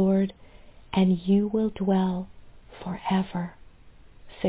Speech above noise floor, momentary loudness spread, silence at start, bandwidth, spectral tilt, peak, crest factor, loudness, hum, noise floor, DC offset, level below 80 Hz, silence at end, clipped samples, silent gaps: 25 dB; 14 LU; 0 s; 4 kHz; -12 dB/octave; -12 dBFS; 16 dB; -26 LUFS; none; -50 dBFS; under 0.1%; -52 dBFS; 0 s; under 0.1%; none